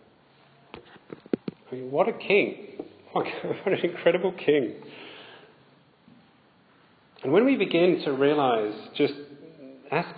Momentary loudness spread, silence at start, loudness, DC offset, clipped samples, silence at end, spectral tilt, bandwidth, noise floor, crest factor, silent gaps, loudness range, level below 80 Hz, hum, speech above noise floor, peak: 24 LU; 0.75 s; -25 LUFS; under 0.1%; under 0.1%; 0 s; -9.5 dB/octave; 5 kHz; -60 dBFS; 20 dB; none; 5 LU; -76 dBFS; none; 35 dB; -8 dBFS